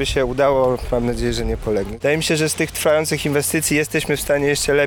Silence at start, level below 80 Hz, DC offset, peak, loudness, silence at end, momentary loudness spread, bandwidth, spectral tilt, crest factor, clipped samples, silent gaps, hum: 0 s; -34 dBFS; under 0.1%; -4 dBFS; -19 LUFS; 0 s; 5 LU; over 20 kHz; -4 dB/octave; 14 dB; under 0.1%; none; none